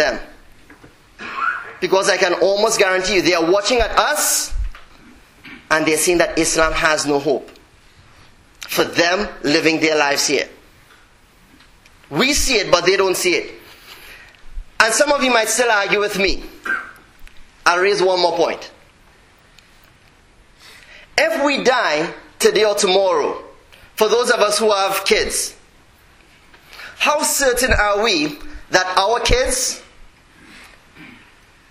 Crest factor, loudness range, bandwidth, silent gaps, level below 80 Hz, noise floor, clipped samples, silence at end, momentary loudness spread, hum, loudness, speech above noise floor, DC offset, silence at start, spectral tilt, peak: 18 dB; 4 LU; 16 kHz; none; -36 dBFS; -50 dBFS; under 0.1%; 0.65 s; 12 LU; none; -16 LUFS; 34 dB; under 0.1%; 0 s; -2 dB/octave; 0 dBFS